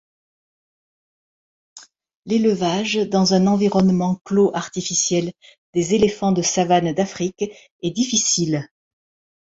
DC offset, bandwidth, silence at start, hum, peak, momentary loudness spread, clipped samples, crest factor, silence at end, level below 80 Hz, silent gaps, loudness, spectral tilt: under 0.1%; 8 kHz; 1.75 s; none; -4 dBFS; 9 LU; under 0.1%; 18 dB; 0.8 s; -56 dBFS; 2.16-2.23 s, 4.21-4.25 s, 5.58-5.73 s, 7.71-7.79 s; -19 LUFS; -4.5 dB/octave